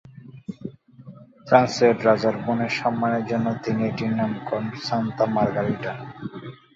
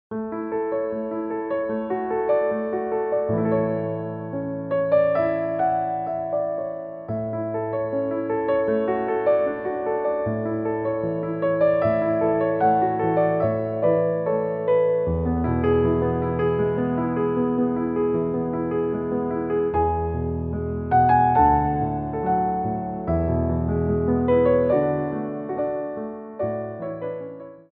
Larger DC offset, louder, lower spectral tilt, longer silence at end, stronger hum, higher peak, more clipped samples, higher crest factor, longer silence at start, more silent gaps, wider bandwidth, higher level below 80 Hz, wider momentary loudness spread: neither; about the same, -23 LUFS vs -23 LUFS; second, -6.5 dB/octave vs -8.5 dB/octave; about the same, 0.2 s vs 0.15 s; neither; about the same, -4 dBFS vs -6 dBFS; neither; about the same, 20 dB vs 16 dB; about the same, 0.05 s vs 0.1 s; neither; first, 7.8 kHz vs 4.7 kHz; second, -60 dBFS vs -42 dBFS; first, 18 LU vs 9 LU